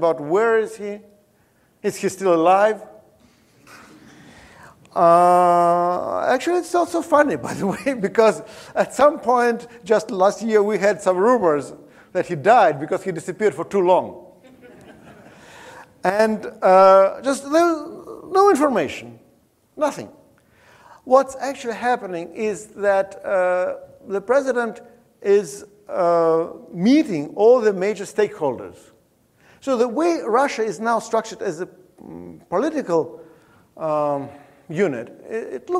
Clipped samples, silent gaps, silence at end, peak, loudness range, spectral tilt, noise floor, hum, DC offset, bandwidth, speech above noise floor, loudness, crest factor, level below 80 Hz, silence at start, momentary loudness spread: under 0.1%; none; 0 s; -2 dBFS; 7 LU; -5.5 dB/octave; -59 dBFS; none; under 0.1%; 15 kHz; 41 dB; -19 LUFS; 18 dB; -64 dBFS; 0 s; 15 LU